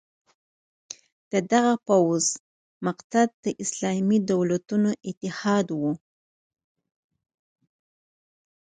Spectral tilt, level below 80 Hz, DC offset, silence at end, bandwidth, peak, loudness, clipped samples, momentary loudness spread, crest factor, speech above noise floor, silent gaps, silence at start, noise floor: -5 dB/octave; -70 dBFS; under 0.1%; 2.75 s; 9.6 kHz; -6 dBFS; -24 LUFS; under 0.1%; 14 LU; 20 dB; over 66 dB; 2.40-2.81 s, 3.04-3.10 s, 3.34-3.43 s, 5.17-5.21 s; 1.3 s; under -90 dBFS